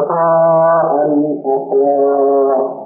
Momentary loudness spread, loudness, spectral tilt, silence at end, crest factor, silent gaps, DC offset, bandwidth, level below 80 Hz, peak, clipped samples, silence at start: 5 LU; -13 LUFS; -14 dB/octave; 0 s; 8 dB; none; under 0.1%; 2.1 kHz; -74 dBFS; -4 dBFS; under 0.1%; 0 s